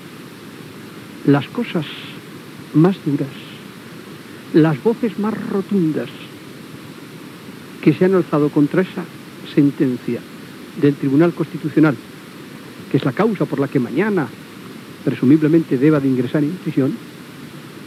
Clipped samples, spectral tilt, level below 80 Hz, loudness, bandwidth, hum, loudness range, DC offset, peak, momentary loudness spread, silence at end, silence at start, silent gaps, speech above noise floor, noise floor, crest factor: under 0.1%; -8 dB/octave; -68 dBFS; -18 LUFS; 15 kHz; none; 4 LU; under 0.1%; 0 dBFS; 20 LU; 0 s; 0 s; none; 19 dB; -36 dBFS; 18 dB